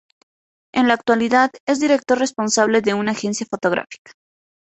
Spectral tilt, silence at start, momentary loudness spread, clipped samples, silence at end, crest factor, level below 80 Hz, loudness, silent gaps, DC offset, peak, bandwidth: -3.5 dB/octave; 0.75 s; 8 LU; under 0.1%; 0.75 s; 18 dB; -62 dBFS; -18 LUFS; 1.60-1.67 s; under 0.1%; -2 dBFS; 8.4 kHz